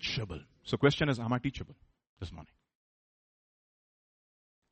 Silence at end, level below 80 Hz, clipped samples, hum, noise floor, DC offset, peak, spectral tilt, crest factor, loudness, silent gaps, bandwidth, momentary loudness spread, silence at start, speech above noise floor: 2.25 s; -56 dBFS; under 0.1%; none; under -90 dBFS; under 0.1%; -12 dBFS; -6 dB/octave; 24 dB; -32 LUFS; 2.09-2.16 s; 8.4 kHz; 19 LU; 0 s; over 57 dB